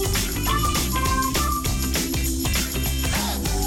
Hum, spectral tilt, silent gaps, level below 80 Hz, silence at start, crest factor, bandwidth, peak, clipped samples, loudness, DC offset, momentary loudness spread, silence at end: none; -3.5 dB/octave; none; -28 dBFS; 0 s; 12 dB; 19.5 kHz; -12 dBFS; under 0.1%; -23 LUFS; under 0.1%; 2 LU; 0 s